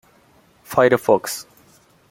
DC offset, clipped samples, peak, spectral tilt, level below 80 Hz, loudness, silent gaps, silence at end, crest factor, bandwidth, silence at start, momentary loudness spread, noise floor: under 0.1%; under 0.1%; -2 dBFS; -4.5 dB/octave; -62 dBFS; -18 LUFS; none; 0.7 s; 20 dB; 17 kHz; 0.7 s; 14 LU; -55 dBFS